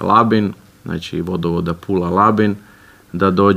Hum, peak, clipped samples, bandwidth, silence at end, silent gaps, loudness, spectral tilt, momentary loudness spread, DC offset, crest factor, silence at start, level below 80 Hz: none; 0 dBFS; under 0.1%; 15 kHz; 0 s; none; -17 LUFS; -8 dB/octave; 15 LU; under 0.1%; 16 dB; 0 s; -46 dBFS